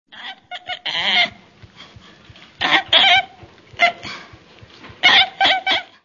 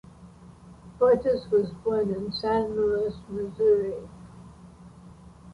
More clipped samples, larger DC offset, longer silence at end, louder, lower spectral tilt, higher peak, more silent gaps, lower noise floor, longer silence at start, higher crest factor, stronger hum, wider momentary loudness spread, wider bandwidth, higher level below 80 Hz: neither; neither; first, 0.2 s vs 0 s; first, -15 LUFS vs -26 LUFS; second, -1.5 dB/octave vs -7 dB/octave; first, 0 dBFS vs -10 dBFS; neither; second, -45 dBFS vs -49 dBFS; about the same, 0.15 s vs 0.2 s; about the same, 20 dB vs 16 dB; neither; first, 22 LU vs 14 LU; second, 7.4 kHz vs 10.5 kHz; second, -58 dBFS vs -52 dBFS